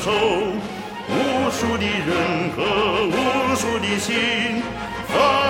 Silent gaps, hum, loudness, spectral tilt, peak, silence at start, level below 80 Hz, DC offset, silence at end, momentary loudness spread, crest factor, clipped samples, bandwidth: none; none; -21 LUFS; -4 dB/octave; -4 dBFS; 0 s; -46 dBFS; under 0.1%; 0 s; 7 LU; 16 dB; under 0.1%; 16.5 kHz